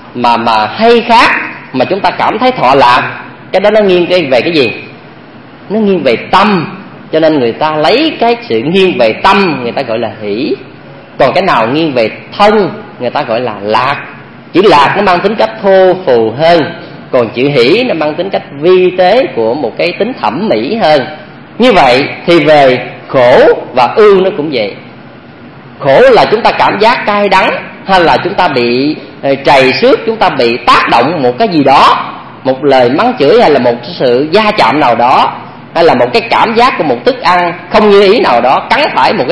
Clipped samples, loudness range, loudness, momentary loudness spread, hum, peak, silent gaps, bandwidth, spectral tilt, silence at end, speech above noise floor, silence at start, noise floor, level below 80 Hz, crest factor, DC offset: 2%; 3 LU; -8 LUFS; 10 LU; none; 0 dBFS; none; 11 kHz; -6 dB/octave; 0 s; 24 dB; 0 s; -32 dBFS; -42 dBFS; 8 dB; under 0.1%